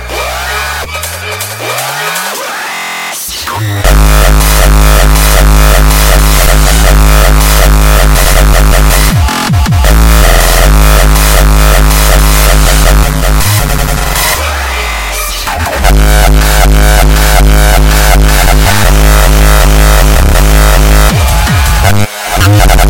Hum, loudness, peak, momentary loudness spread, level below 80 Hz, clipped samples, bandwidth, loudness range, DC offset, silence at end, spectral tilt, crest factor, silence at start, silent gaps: none; -7 LUFS; 0 dBFS; 7 LU; -6 dBFS; 0.3%; 17.5 kHz; 4 LU; under 0.1%; 0 s; -4 dB/octave; 6 dB; 0 s; none